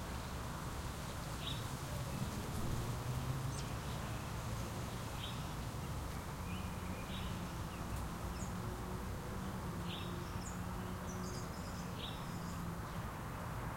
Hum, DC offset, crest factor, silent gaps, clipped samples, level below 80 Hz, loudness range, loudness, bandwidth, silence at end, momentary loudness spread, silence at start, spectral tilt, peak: none; under 0.1%; 16 dB; none; under 0.1%; -50 dBFS; 2 LU; -44 LUFS; 16.5 kHz; 0 s; 3 LU; 0 s; -5 dB/octave; -28 dBFS